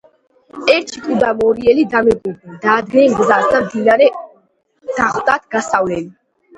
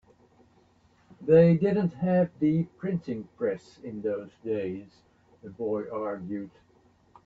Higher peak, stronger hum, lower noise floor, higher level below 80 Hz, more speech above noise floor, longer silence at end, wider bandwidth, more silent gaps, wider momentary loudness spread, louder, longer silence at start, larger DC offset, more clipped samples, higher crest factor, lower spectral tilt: first, 0 dBFS vs -8 dBFS; neither; second, -57 dBFS vs -63 dBFS; first, -48 dBFS vs -64 dBFS; first, 43 dB vs 36 dB; second, 0.45 s vs 0.8 s; first, 10.5 kHz vs 5.2 kHz; neither; second, 11 LU vs 17 LU; first, -14 LUFS vs -27 LUFS; second, 0.55 s vs 1.2 s; neither; neither; about the same, 16 dB vs 20 dB; second, -5 dB/octave vs -10 dB/octave